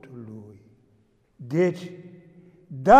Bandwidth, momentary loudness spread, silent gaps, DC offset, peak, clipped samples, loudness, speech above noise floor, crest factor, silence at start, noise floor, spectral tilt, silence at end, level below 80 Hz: 10 kHz; 24 LU; none; under 0.1%; -4 dBFS; under 0.1%; -28 LUFS; 44 dB; 20 dB; 0.15 s; -63 dBFS; -7.5 dB/octave; 0 s; -54 dBFS